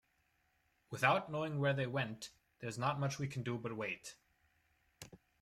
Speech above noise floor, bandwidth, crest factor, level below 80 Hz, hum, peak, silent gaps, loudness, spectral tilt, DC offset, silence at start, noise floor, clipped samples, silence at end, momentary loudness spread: 40 dB; 14.5 kHz; 24 dB; -74 dBFS; none; -18 dBFS; none; -38 LUFS; -5.5 dB/octave; under 0.1%; 0.9 s; -78 dBFS; under 0.1%; 0.25 s; 21 LU